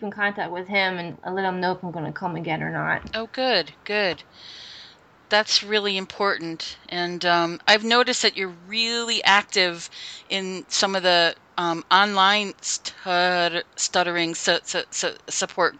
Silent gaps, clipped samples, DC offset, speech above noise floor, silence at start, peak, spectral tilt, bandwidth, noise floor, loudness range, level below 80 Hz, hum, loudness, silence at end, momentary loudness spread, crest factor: none; under 0.1%; under 0.1%; 26 dB; 0 s; -2 dBFS; -2 dB/octave; 9.4 kHz; -49 dBFS; 5 LU; -62 dBFS; none; -22 LUFS; 0 s; 12 LU; 22 dB